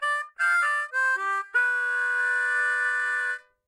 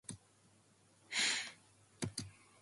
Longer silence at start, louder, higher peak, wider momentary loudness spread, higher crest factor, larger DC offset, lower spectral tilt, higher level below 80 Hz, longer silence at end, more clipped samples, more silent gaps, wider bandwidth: about the same, 0 s vs 0.1 s; first, -24 LUFS vs -39 LUFS; first, -14 dBFS vs -22 dBFS; second, 3 LU vs 19 LU; second, 12 dB vs 22 dB; neither; second, 2 dB/octave vs -1.5 dB/octave; second, -88 dBFS vs -72 dBFS; about the same, 0.3 s vs 0.3 s; neither; neither; first, 13 kHz vs 11.5 kHz